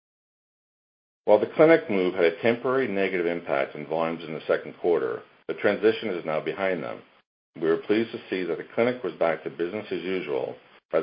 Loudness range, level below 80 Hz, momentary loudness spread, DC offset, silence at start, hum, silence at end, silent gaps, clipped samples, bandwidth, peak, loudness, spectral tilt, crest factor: 5 LU; -70 dBFS; 10 LU; under 0.1%; 1.25 s; none; 0 s; 7.26-7.54 s, 10.85-10.89 s; under 0.1%; 5.4 kHz; -4 dBFS; -26 LUFS; -10 dB/octave; 22 dB